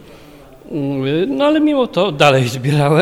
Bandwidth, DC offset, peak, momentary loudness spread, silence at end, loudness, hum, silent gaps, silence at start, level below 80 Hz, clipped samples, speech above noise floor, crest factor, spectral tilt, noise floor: 16 kHz; under 0.1%; 0 dBFS; 9 LU; 0 s; -15 LUFS; none; none; 0.05 s; -50 dBFS; under 0.1%; 26 dB; 16 dB; -6 dB/octave; -40 dBFS